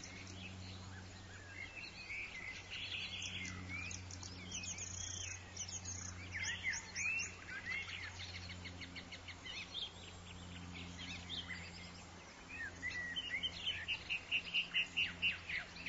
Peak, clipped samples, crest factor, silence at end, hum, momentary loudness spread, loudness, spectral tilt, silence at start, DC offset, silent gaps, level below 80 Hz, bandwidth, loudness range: -26 dBFS; under 0.1%; 20 dB; 0 s; none; 14 LU; -43 LUFS; -1 dB/octave; 0 s; under 0.1%; none; -60 dBFS; 7.6 kHz; 8 LU